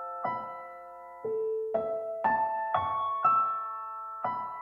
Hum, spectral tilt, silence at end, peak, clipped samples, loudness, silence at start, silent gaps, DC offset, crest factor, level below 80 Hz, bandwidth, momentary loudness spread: none; -7 dB/octave; 0 s; -14 dBFS; under 0.1%; -31 LUFS; 0 s; none; under 0.1%; 18 dB; -70 dBFS; 5.8 kHz; 15 LU